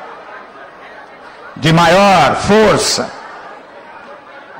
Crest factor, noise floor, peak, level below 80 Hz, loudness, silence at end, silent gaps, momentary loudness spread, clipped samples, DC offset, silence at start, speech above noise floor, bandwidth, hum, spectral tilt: 10 dB; -35 dBFS; -4 dBFS; -40 dBFS; -10 LUFS; 0 s; none; 26 LU; under 0.1%; under 0.1%; 0 s; 25 dB; 16 kHz; none; -4.5 dB/octave